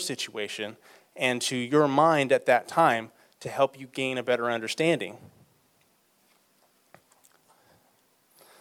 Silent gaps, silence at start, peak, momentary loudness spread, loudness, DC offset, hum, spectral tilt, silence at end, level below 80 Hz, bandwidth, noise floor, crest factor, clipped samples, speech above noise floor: none; 0 s; -8 dBFS; 14 LU; -26 LUFS; under 0.1%; none; -4 dB/octave; 3.35 s; -78 dBFS; 16.5 kHz; -66 dBFS; 22 dB; under 0.1%; 41 dB